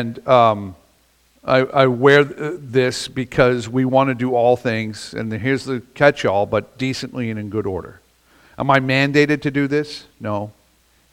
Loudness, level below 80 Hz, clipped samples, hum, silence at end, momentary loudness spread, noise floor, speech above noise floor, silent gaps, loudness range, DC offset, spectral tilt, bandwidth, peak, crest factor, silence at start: -18 LUFS; -50 dBFS; under 0.1%; none; 0.65 s; 13 LU; -58 dBFS; 40 dB; none; 4 LU; under 0.1%; -6 dB/octave; 15.5 kHz; 0 dBFS; 18 dB; 0 s